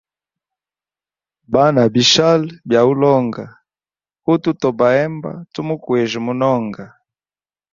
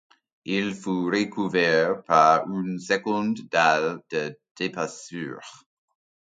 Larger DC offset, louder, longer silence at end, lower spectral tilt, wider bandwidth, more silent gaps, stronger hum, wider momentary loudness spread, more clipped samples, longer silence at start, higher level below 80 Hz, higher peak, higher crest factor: neither; first, -15 LUFS vs -24 LUFS; about the same, 0.85 s vs 0.75 s; about the same, -5 dB/octave vs -5 dB/octave; second, 7.6 kHz vs 9.4 kHz; second, none vs 4.51-4.55 s; neither; about the same, 16 LU vs 15 LU; neither; first, 1.5 s vs 0.45 s; first, -58 dBFS vs -70 dBFS; about the same, -2 dBFS vs -4 dBFS; second, 16 dB vs 22 dB